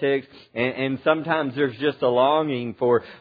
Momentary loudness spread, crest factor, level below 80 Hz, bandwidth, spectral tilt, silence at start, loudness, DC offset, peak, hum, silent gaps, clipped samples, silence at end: 7 LU; 18 dB; -66 dBFS; 5 kHz; -9 dB/octave; 0 s; -23 LUFS; under 0.1%; -4 dBFS; none; none; under 0.1%; 0.05 s